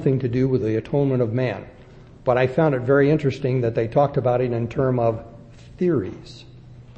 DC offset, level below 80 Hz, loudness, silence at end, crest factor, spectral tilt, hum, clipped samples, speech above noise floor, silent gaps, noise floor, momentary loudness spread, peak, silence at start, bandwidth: under 0.1%; -48 dBFS; -21 LUFS; 0.05 s; 16 dB; -9 dB/octave; none; under 0.1%; 24 dB; none; -45 dBFS; 9 LU; -6 dBFS; 0 s; 7.8 kHz